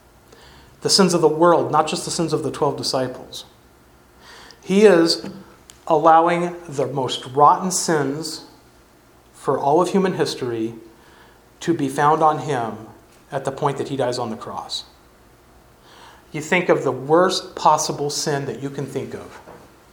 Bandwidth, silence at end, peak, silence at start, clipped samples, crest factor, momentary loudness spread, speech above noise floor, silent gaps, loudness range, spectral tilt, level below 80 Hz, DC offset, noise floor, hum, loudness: 19 kHz; 0.35 s; 0 dBFS; 0.8 s; under 0.1%; 20 dB; 15 LU; 32 dB; none; 6 LU; -4.5 dB/octave; -58 dBFS; under 0.1%; -51 dBFS; none; -19 LUFS